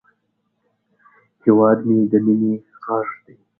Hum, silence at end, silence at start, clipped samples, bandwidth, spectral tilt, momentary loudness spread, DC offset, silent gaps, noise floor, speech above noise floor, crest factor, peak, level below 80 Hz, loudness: none; 0.45 s; 1.45 s; under 0.1%; 2.4 kHz; -13 dB/octave; 13 LU; under 0.1%; none; -70 dBFS; 54 dB; 18 dB; 0 dBFS; -66 dBFS; -18 LUFS